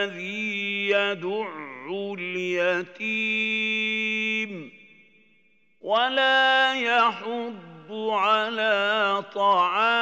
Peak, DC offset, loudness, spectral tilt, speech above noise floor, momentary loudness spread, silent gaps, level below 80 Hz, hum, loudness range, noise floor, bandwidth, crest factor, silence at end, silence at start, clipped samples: -8 dBFS; under 0.1%; -23 LUFS; -3.5 dB/octave; 41 dB; 13 LU; none; -88 dBFS; none; 4 LU; -65 dBFS; 16 kHz; 16 dB; 0 s; 0 s; under 0.1%